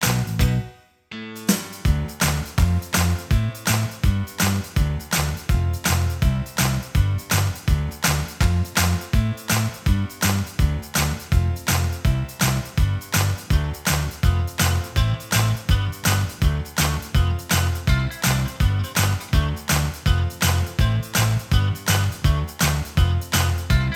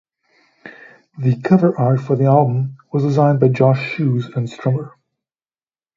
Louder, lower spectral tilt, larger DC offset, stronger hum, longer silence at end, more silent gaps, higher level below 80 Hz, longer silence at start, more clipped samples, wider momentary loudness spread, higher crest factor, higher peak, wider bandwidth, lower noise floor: second, -22 LUFS vs -17 LUFS; second, -4.5 dB/octave vs -9.5 dB/octave; neither; neither; second, 0 s vs 1.1 s; neither; first, -26 dBFS vs -60 dBFS; second, 0 s vs 0.65 s; neither; second, 3 LU vs 9 LU; about the same, 16 dB vs 18 dB; second, -4 dBFS vs 0 dBFS; first, 19.5 kHz vs 7.4 kHz; second, -42 dBFS vs under -90 dBFS